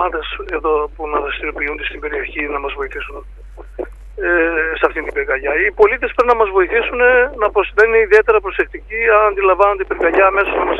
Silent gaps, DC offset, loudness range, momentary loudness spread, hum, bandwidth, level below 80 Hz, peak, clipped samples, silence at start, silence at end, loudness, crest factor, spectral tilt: none; under 0.1%; 8 LU; 12 LU; none; 6.8 kHz; -34 dBFS; 0 dBFS; under 0.1%; 0 s; 0 s; -15 LUFS; 16 dB; -6 dB/octave